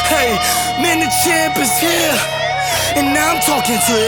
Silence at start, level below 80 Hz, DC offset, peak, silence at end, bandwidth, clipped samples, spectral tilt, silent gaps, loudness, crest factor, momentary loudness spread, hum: 0 s; -40 dBFS; under 0.1%; -2 dBFS; 0 s; 19.5 kHz; under 0.1%; -2 dB/octave; none; -14 LUFS; 14 dB; 3 LU; none